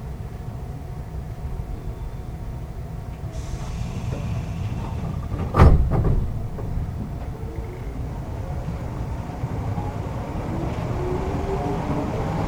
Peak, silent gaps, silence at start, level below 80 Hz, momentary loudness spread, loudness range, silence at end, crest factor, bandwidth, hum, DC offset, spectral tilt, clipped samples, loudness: 0 dBFS; none; 0 s; -28 dBFS; 11 LU; 10 LU; 0 s; 24 dB; 15.5 kHz; none; under 0.1%; -8 dB/octave; under 0.1%; -27 LUFS